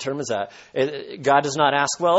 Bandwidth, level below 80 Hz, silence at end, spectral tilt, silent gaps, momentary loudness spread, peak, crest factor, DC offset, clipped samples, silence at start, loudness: 8.2 kHz; -64 dBFS; 0 s; -3.5 dB/octave; none; 8 LU; -4 dBFS; 18 dB; under 0.1%; under 0.1%; 0 s; -22 LUFS